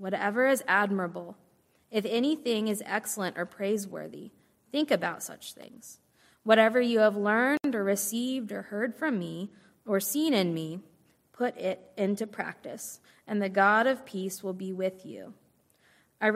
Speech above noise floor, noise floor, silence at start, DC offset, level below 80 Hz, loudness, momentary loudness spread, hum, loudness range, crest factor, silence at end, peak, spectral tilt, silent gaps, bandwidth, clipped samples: 37 dB; -65 dBFS; 0 s; under 0.1%; -80 dBFS; -29 LUFS; 20 LU; none; 6 LU; 24 dB; 0 s; -6 dBFS; -4 dB/octave; none; 16 kHz; under 0.1%